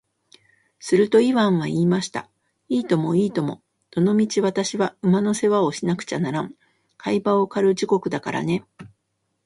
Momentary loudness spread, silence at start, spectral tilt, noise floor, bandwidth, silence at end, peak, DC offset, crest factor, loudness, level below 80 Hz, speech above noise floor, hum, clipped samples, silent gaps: 11 LU; 0.8 s; -6 dB/octave; -74 dBFS; 11.5 kHz; 0.6 s; -6 dBFS; under 0.1%; 16 dB; -21 LUFS; -64 dBFS; 53 dB; none; under 0.1%; none